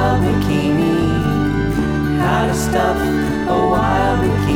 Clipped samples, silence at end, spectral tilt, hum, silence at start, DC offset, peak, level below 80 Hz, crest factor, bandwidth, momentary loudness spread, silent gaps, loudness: under 0.1%; 0 s; -6.5 dB/octave; none; 0 s; under 0.1%; -4 dBFS; -28 dBFS; 10 dB; 17 kHz; 3 LU; none; -16 LUFS